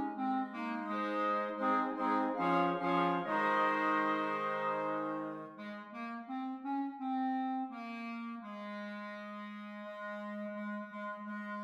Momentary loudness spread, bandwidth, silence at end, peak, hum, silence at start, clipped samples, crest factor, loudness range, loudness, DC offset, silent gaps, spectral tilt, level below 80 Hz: 13 LU; 9.2 kHz; 0 s; -20 dBFS; none; 0 s; under 0.1%; 16 dB; 11 LU; -36 LUFS; under 0.1%; none; -7 dB/octave; -90 dBFS